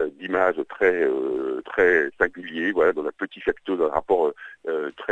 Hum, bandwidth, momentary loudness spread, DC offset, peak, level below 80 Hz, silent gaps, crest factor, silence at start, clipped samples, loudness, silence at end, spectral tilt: none; 6.8 kHz; 9 LU; under 0.1%; -2 dBFS; -54 dBFS; none; 20 dB; 0 s; under 0.1%; -23 LUFS; 0 s; -6 dB/octave